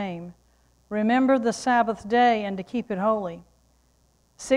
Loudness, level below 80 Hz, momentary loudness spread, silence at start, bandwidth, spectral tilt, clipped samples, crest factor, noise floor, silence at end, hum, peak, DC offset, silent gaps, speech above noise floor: -23 LUFS; -60 dBFS; 18 LU; 0 s; 11.5 kHz; -5 dB/octave; under 0.1%; 16 dB; -64 dBFS; 0 s; none; -8 dBFS; under 0.1%; none; 40 dB